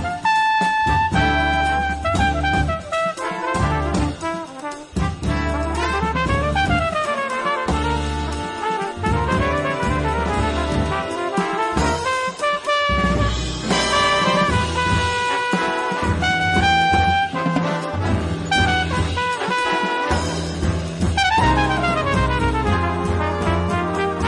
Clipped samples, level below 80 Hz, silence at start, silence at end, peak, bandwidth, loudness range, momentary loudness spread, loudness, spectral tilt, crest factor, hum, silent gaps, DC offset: under 0.1%; -30 dBFS; 0 s; 0 s; -6 dBFS; 11.5 kHz; 3 LU; 6 LU; -20 LUFS; -5 dB/octave; 14 dB; none; none; under 0.1%